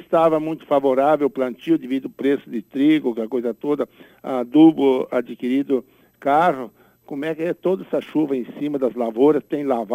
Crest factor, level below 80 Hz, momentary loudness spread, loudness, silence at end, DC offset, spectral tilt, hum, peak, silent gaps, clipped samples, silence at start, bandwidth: 16 dB; -66 dBFS; 10 LU; -20 LUFS; 0 s; under 0.1%; -7.5 dB/octave; none; -2 dBFS; none; under 0.1%; 0.1 s; 12.5 kHz